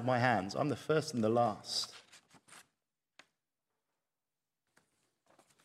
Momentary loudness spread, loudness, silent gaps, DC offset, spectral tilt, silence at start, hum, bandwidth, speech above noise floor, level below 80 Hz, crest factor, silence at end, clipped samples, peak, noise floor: 7 LU; -34 LUFS; none; under 0.1%; -5 dB/octave; 0 s; none; 15 kHz; over 57 dB; -80 dBFS; 24 dB; 3.05 s; under 0.1%; -14 dBFS; under -90 dBFS